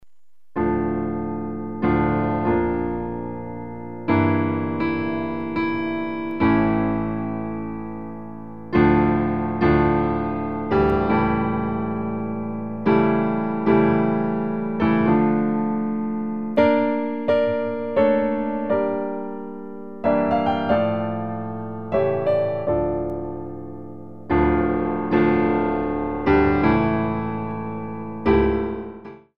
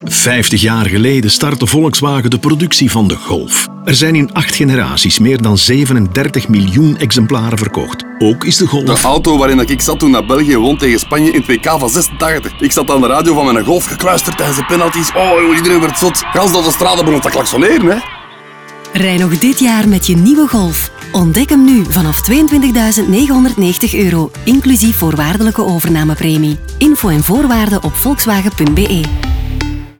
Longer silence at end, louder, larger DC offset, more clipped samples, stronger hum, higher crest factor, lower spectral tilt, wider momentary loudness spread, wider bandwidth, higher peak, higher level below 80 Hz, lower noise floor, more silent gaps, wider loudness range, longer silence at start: about the same, 0 s vs 0.1 s; second, -22 LUFS vs -10 LUFS; first, 0.9% vs under 0.1%; neither; neither; first, 18 dB vs 10 dB; first, -10 dB/octave vs -4.5 dB/octave; first, 13 LU vs 5 LU; second, 5.4 kHz vs over 20 kHz; second, -4 dBFS vs 0 dBFS; second, -40 dBFS vs -26 dBFS; first, -78 dBFS vs -33 dBFS; neither; about the same, 4 LU vs 2 LU; about the same, 0 s vs 0 s